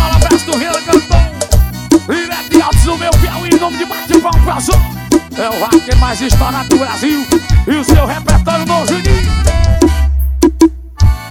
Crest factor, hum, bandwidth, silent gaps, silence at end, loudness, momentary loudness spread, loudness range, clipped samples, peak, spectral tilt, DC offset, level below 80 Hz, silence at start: 10 dB; none; 17.5 kHz; none; 0 s; -12 LUFS; 4 LU; 1 LU; 2%; 0 dBFS; -5.5 dB/octave; under 0.1%; -14 dBFS; 0 s